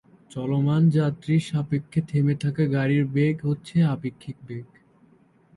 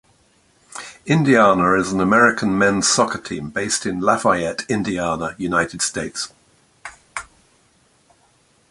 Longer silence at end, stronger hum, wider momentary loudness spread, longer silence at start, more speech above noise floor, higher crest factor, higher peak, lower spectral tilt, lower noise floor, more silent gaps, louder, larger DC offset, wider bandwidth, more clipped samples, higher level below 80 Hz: second, 0.9 s vs 1.5 s; neither; about the same, 17 LU vs 19 LU; second, 0.35 s vs 0.75 s; second, 35 dB vs 40 dB; second, 14 dB vs 20 dB; second, -10 dBFS vs 0 dBFS; first, -8.5 dB/octave vs -4 dB/octave; about the same, -58 dBFS vs -58 dBFS; neither; second, -24 LUFS vs -18 LUFS; neither; about the same, 11.5 kHz vs 11.5 kHz; neither; second, -60 dBFS vs -50 dBFS